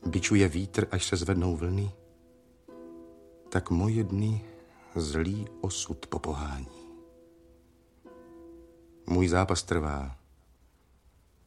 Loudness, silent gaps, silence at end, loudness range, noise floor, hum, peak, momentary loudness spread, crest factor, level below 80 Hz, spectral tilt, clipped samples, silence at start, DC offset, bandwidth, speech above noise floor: -30 LUFS; none; 1.3 s; 7 LU; -63 dBFS; none; -10 dBFS; 25 LU; 22 dB; -46 dBFS; -5.5 dB/octave; under 0.1%; 0 s; under 0.1%; 12 kHz; 35 dB